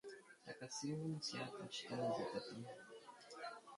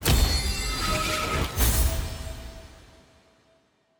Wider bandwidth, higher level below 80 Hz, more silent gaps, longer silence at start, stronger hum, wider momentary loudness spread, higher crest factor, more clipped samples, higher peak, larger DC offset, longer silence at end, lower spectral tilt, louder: second, 11.5 kHz vs over 20 kHz; second, -84 dBFS vs -30 dBFS; neither; about the same, 0.05 s vs 0 s; neither; about the same, 15 LU vs 17 LU; about the same, 16 dB vs 20 dB; neither; second, -32 dBFS vs -8 dBFS; neither; second, 0 s vs 1.2 s; about the same, -4.5 dB/octave vs -3.5 dB/octave; second, -47 LUFS vs -25 LUFS